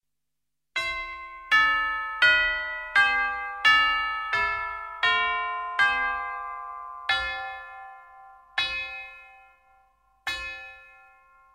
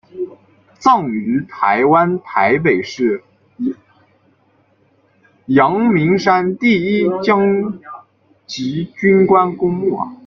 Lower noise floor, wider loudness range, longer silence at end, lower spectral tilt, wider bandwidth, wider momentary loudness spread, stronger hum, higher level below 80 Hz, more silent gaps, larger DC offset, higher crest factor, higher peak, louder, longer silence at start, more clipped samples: first, -86 dBFS vs -57 dBFS; first, 12 LU vs 5 LU; first, 0.65 s vs 0.1 s; second, -1 dB/octave vs -7 dB/octave; first, 16 kHz vs 7.2 kHz; first, 18 LU vs 13 LU; neither; about the same, -54 dBFS vs -56 dBFS; neither; neither; first, 20 dB vs 14 dB; second, -8 dBFS vs -2 dBFS; second, -24 LUFS vs -15 LUFS; first, 0.75 s vs 0.15 s; neither